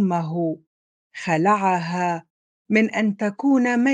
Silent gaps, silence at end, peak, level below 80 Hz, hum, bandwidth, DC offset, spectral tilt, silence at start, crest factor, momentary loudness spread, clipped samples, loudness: 0.67-1.10 s, 2.30-2.65 s; 0 s; -4 dBFS; -72 dBFS; none; 9.2 kHz; under 0.1%; -6.5 dB/octave; 0 s; 18 dB; 12 LU; under 0.1%; -21 LUFS